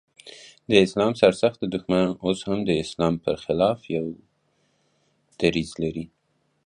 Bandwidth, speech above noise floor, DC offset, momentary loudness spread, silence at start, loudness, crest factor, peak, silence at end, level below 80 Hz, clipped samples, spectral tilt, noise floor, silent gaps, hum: 11 kHz; 46 dB; under 0.1%; 22 LU; 0.25 s; -23 LUFS; 22 dB; -2 dBFS; 0.6 s; -52 dBFS; under 0.1%; -6 dB/octave; -68 dBFS; none; none